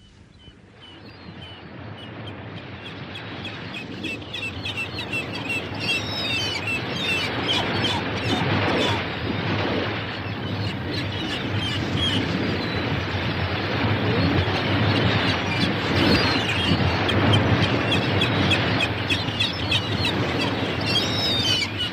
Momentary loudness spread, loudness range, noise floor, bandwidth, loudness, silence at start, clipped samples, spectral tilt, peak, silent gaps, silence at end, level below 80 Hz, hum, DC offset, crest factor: 15 LU; 11 LU; -48 dBFS; 15 kHz; -23 LUFS; 0.2 s; under 0.1%; -5 dB/octave; -6 dBFS; none; 0 s; -44 dBFS; none; under 0.1%; 18 dB